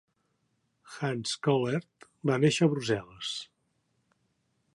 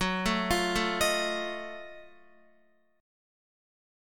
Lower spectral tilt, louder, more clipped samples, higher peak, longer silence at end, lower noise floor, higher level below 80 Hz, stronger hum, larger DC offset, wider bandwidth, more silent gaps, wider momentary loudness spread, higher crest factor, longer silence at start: first, -5.5 dB/octave vs -3.5 dB/octave; about the same, -29 LUFS vs -29 LUFS; neither; about the same, -12 dBFS vs -14 dBFS; first, 1.3 s vs 1 s; first, -76 dBFS vs -68 dBFS; second, -70 dBFS vs -50 dBFS; neither; neither; second, 11.5 kHz vs 17.5 kHz; neither; second, 12 LU vs 16 LU; about the same, 20 dB vs 20 dB; first, 0.9 s vs 0 s